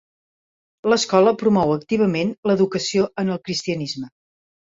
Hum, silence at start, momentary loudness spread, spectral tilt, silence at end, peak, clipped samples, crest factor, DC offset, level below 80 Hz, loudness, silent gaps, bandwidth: none; 0.85 s; 10 LU; -5 dB/octave; 0.6 s; -2 dBFS; under 0.1%; 18 dB; under 0.1%; -58 dBFS; -20 LUFS; 2.38-2.43 s; 7.8 kHz